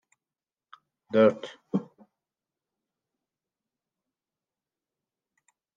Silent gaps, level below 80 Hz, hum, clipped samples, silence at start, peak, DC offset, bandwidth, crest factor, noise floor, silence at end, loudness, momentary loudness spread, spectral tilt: none; -84 dBFS; none; under 0.1%; 1.15 s; -8 dBFS; under 0.1%; 7.6 kHz; 26 dB; under -90 dBFS; 3.95 s; -26 LUFS; 12 LU; -7.5 dB/octave